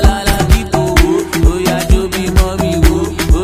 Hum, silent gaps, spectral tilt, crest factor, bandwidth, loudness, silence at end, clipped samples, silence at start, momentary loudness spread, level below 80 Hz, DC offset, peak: none; none; -5.5 dB/octave; 10 dB; 16 kHz; -13 LUFS; 0 s; 1%; 0 s; 2 LU; -14 dBFS; under 0.1%; 0 dBFS